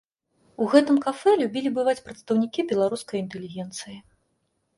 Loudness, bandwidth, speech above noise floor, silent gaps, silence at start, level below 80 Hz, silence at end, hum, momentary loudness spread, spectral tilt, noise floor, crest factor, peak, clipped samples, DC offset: -24 LUFS; 11.5 kHz; 50 dB; none; 0.6 s; -68 dBFS; 0.75 s; none; 15 LU; -5.5 dB/octave; -73 dBFS; 20 dB; -4 dBFS; under 0.1%; under 0.1%